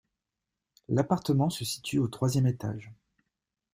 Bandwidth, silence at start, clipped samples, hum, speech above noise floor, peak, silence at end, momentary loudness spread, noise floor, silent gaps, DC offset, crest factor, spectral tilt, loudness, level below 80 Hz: 16 kHz; 0.9 s; under 0.1%; none; 59 dB; -10 dBFS; 0.8 s; 9 LU; -87 dBFS; none; under 0.1%; 20 dB; -6 dB/octave; -29 LUFS; -62 dBFS